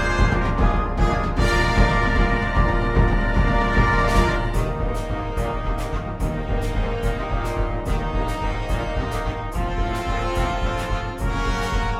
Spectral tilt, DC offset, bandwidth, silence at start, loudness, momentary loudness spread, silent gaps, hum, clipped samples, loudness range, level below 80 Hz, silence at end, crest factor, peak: -6 dB/octave; under 0.1%; 12.5 kHz; 0 s; -23 LUFS; 8 LU; none; none; under 0.1%; 6 LU; -24 dBFS; 0 s; 16 dB; -4 dBFS